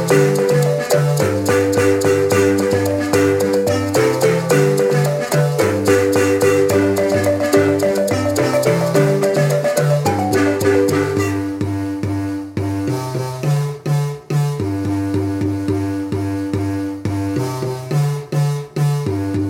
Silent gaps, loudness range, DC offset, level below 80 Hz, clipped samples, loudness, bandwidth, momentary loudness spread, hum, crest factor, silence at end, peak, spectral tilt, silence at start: none; 5 LU; under 0.1%; -50 dBFS; under 0.1%; -17 LUFS; 17 kHz; 7 LU; none; 14 dB; 0 s; -2 dBFS; -6 dB/octave; 0 s